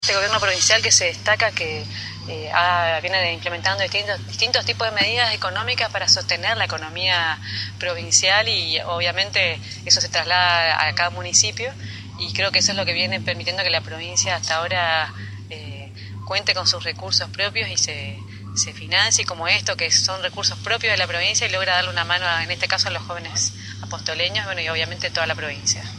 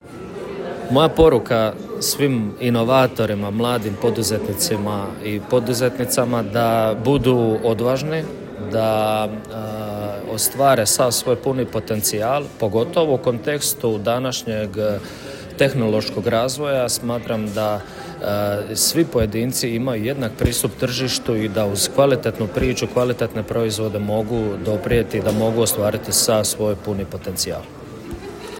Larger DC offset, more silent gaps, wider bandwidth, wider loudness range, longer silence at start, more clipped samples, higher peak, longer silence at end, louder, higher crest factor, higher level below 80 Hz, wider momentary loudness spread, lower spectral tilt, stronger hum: neither; neither; second, 12 kHz vs 17 kHz; about the same, 4 LU vs 3 LU; about the same, 0 s vs 0.05 s; neither; about the same, 0 dBFS vs -2 dBFS; about the same, 0 s vs 0 s; about the same, -19 LUFS vs -20 LUFS; about the same, 22 dB vs 18 dB; second, -54 dBFS vs -42 dBFS; about the same, 12 LU vs 11 LU; second, -1 dB/octave vs -4.5 dB/octave; neither